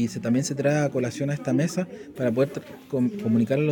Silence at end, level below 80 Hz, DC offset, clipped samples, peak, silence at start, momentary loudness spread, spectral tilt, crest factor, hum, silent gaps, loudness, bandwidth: 0 s; -64 dBFS; under 0.1%; under 0.1%; -10 dBFS; 0 s; 7 LU; -6.5 dB/octave; 14 dB; none; none; -25 LUFS; 17 kHz